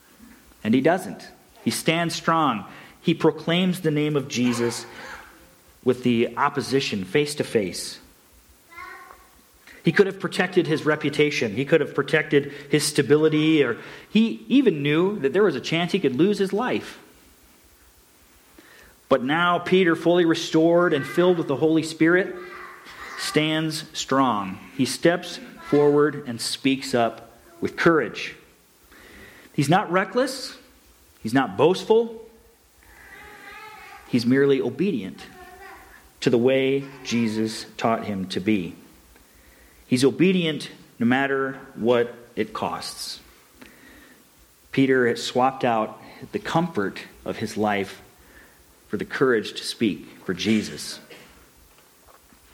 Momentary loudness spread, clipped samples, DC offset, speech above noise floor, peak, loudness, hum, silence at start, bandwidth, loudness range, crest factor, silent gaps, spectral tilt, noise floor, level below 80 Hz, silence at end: 17 LU; under 0.1%; under 0.1%; 33 dB; -6 dBFS; -23 LUFS; none; 0.65 s; 18.5 kHz; 6 LU; 18 dB; none; -5 dB/octave; -55 dBFS; -62 dBFS; 1.35 s